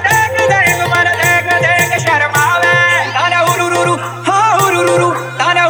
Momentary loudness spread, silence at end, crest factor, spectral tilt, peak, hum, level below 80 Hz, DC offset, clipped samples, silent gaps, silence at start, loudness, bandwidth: 4 LU; 0 s; 12 dB; -3.5 dB/octave; 0 dBFS; none; -58 dBFS; under 0.1%; under 0.1%; none; 0 s; -11 LUFS; over 20 kHz